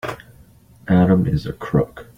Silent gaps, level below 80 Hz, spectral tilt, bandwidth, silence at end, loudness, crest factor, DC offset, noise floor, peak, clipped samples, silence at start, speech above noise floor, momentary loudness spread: none; -42 dBFS; -9 dB/octave; 9.4 kHz; 0.15 s; -18 LUFS; 18 dB; under 0.1%; -48 dBFS; -2 dBFS; under 0.1%; 0.05 s; 31 dB; 20 LU